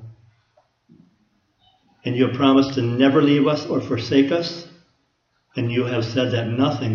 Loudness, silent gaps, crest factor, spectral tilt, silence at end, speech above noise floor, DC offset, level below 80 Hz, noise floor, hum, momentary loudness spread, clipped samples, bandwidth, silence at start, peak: -20 LUFS; none; 18 dB; -7 dB/octave; 0 s; 49 dB; under 0.1%; -60 dBFS; -68 dBFS; none; 11 LU; under 0.1%; 6.8 kHz; 0 s; -2 dBFS